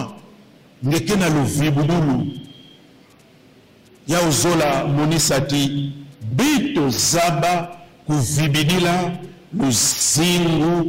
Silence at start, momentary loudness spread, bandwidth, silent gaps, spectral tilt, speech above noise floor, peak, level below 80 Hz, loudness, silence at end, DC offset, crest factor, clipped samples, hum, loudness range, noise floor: 0 s; 13 LU; 16.5 kHz; none; -4 dB/octave; 32 dB; -8 dBFS; -44 dBFS; -18 LUFS; 0 s; under 0.1%; 12 dB; under 0.1%; none; 3 LU; -49 dBFS